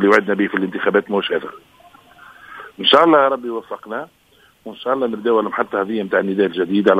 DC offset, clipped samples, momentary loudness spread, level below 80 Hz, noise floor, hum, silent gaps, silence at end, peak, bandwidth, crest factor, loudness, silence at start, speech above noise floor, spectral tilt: under 0.1%; under 0.1%; 23 LU; -62 dBFS; -47 dBFS; none; none; 0 s; 0 dBFS; 14 kHz; 18 dB; -17 LUFS; 0 s; 29 dB; -6 dB/octave